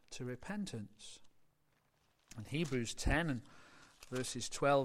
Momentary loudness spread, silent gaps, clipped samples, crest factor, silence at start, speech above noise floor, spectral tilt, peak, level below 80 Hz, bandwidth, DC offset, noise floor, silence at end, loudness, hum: 22 LU; none; under 0.1%; 20 dB; 0.1 s; 39 dB; -4.5 dB/octave; -20 dBFS; -52 dBFS; 16 kHz; under 0.1%; -77 dBFS; 0 s; -40 LUFS; none